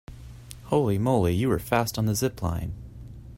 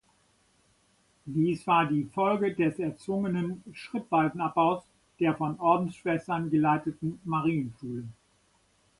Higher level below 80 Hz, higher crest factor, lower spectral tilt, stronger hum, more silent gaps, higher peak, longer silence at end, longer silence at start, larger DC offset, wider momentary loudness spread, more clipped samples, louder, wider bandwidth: first, -44 dBFS vs -66 dBFS; about the same, 18 dB vs 20 dB; second, -6 dB/octave vs -8 dB/octave; neither; neither; about the same, -8 dBFS vs -10 dBFS; second, 0 s vs 0.85 s; second, 0.1 s vs 1.25 s; neither; first, 20 LU vs 12 LU; neither; first, -25 LUFS vs -29 LUFS; first, 16 kHz vs 11.5 kHz